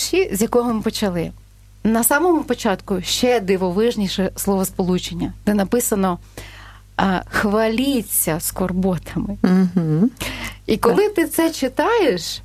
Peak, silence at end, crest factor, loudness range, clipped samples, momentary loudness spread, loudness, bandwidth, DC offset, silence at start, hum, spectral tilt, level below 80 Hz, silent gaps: 0 dBFS; 0 s; 20 dB; 2 LU; under 0.1%; 8 LU; -19 LUFS; 14.5 kHz; under 0.1%; 0 s; none; -4.5 dB/octave; -40 dBFS; none